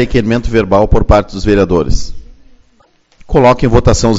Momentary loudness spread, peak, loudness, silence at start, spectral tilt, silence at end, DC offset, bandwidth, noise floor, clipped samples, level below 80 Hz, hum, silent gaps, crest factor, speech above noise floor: 7 LU; 0 dBFS; -11 LUFS; 0 s; -6.5 dB/octave; 0 s; under 0.1%; 8 kHz; -51 dBFS; 0.6%; -18 dBFS; none; none; 10 dB; 42 dB